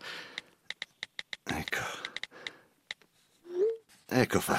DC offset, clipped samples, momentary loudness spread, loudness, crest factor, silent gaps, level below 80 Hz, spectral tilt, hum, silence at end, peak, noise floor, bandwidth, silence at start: under 0.1%; under 0.1%; 16 LU; -36 LUFS; 24 dB; none; -64 dBFS; -4 dB/octave; none; 0 s; -12 dBFS; -67 dBFS; 16 kHz; 0 s